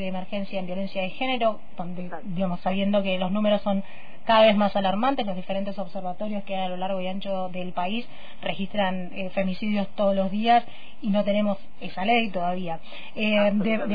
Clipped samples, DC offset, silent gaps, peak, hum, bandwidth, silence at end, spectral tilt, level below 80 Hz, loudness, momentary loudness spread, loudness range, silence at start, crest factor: under 0.1%; 4%; none; -8 dBFS; none; 5 kHz; 0 s; -8.5 dB/octave; -56 dBFS; -26 LUFS; 13 LU; 6 LU; 0 s; 18 dB